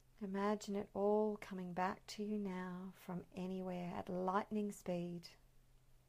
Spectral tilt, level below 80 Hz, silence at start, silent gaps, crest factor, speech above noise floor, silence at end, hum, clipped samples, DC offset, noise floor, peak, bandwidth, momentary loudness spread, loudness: -6.5 dB/octave; -70 dBFS; 0.2 s; none; 18 dB; 25 dB; 0.1 s; none; under 0.1%; under 0.1%; -67 dBFS; -26 dBFS; 15.5 kHz; 11 LU; -43 LUFS